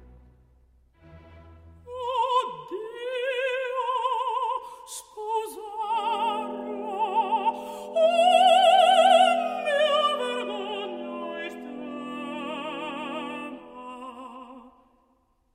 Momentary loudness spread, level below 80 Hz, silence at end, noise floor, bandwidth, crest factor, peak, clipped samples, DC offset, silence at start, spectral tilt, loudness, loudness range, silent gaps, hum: 21 LU; -64 dBFS; 0.85 s; -67 dBFS; 15.5 kHz; 20 dB; -6 dBFS; under 0.1%; under 0.1%; 1.1 s; -2.5 dB/octave; -25 LUFS; 15 LU; none; none